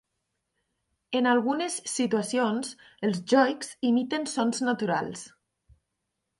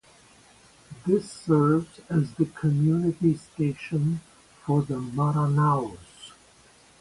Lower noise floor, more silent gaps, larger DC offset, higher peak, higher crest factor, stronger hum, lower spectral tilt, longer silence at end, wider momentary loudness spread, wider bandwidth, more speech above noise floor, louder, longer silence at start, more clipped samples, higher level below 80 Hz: first, -82 dBFS vs -56 dBFS; neither; neither; about the same, -8 dBFS vs -10 dBFS; about the same, 20 dB vs 16 dB; neither; second, -4 dB/octave vs -8.5 dB/octave; first, 1.1 s vs 0.7 s; second, 9 LU vs 14 LU; about the same, 11.5 kHz vs 11.5 kHz; first, 55 dB vs 32 dB; about the same, -27 LUFS vs -25 LUFS; first, 1.1 s vs 0.9 s; neither; second, -72 dBFS vs -58 dBFS